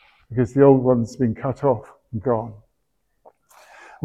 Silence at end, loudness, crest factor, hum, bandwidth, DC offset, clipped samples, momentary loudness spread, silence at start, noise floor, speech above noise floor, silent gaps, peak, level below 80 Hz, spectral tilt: 1.5 s; -20 LUFS; 20 dB; none; 8.4 kHz; under 0.1%; under 0.1%; 14 LU; 0.3 s; -73 dBFS; 54 dB; none; -2 dBFS; -52 dBFS; -9.5 dB/octave